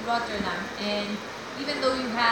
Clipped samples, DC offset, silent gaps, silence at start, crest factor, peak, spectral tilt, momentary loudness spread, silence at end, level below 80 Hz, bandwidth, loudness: under 0.1%; under 0.1%; none; 0 s; 18 dB; -10 dBFS; -4 dB/octave; 7 LU; 0 s; -56 dBFS; 17 kHz; -28 LUFS